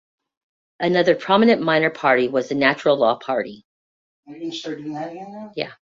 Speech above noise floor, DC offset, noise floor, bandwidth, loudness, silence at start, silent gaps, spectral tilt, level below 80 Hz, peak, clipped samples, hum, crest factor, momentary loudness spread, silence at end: over 70 dB; under 0.1%; under -90 dBFS; 7.6 kHz; -19 LUFS; 0.8 s; 3.65-4.23 s; -5.5 dB/octave; -64 dBFS; -2 dBFS; under 0.1%; none; 18 dB; 16 LU; 0.2 s